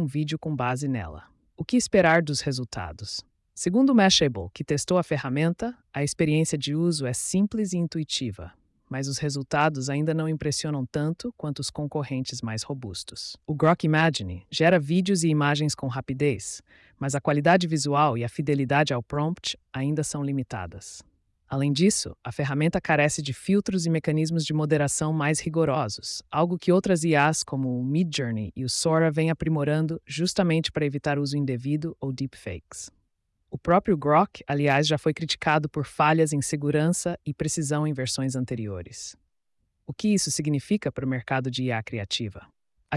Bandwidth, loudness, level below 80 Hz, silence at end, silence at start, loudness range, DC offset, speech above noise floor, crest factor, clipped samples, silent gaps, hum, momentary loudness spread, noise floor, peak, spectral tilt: 12 kHz; -25 LUFS; -56 dBFS; 0 s; 0 s; 5 LU; under 0.1%; 49 dB; 16 dB; under 0.1%; none; none; 12 LU; -74 dBFS; -8 dBFS; -5 dB/octave